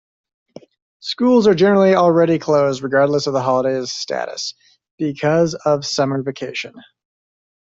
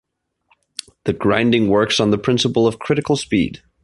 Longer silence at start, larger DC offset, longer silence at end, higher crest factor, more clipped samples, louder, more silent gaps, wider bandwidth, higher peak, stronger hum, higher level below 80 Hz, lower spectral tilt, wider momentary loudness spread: about the same, 1.05 s vs 1.05 s; neither; first, 0.95 s vs 0.25 s; about the same, 16 dB vs 18 dB; neither; about the same, -17 LUFS vs -17 LUFS; first, 4.91-4.98 s vs none; second, 7.8 kHz vs 11.5 kHz; about the same, -2 dBFS vs 0 dBFS; neither; second, -60 dBFS vs -46 dBFS; about the same, -5.5 dB/octave vs -5 dB/octave; first, 14 LU vs 11 LU